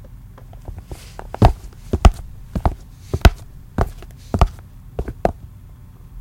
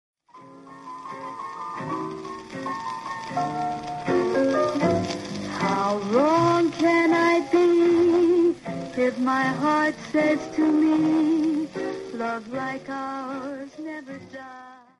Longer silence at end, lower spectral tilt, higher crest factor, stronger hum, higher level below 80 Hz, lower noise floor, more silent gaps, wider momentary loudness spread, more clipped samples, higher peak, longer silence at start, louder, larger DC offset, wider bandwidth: second, 0 s vs 0.25 s; about the same, -6.5 dB/octave vs -6 dB/octave; about the same, 20 dB vs 16 dB; neither; first, -24 dBFS vs -62 dBFS; second, -40 dBFS vs -48 dBFS; neither; first, 24 LU vs 17 LU; first, 0.1% vs under 0.1%; first, 0 dBFS vs -8 dBFS; second, 0.15 s vs 0.35 s; first, -20 LUFS vs -23 LUFS; neither; first, 16.5 kHz vs 11.5 kHz